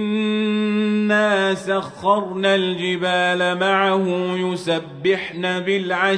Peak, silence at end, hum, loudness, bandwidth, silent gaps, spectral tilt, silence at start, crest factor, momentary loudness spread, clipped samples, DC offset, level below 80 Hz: -4 dBFS; 0 s; none; -19 LUFS; 10.5 kHz; none; -5.5 dB/octave; 0 s; 14 dB; 5 LU; under 0.1%; under 0.1%; -64 dBFS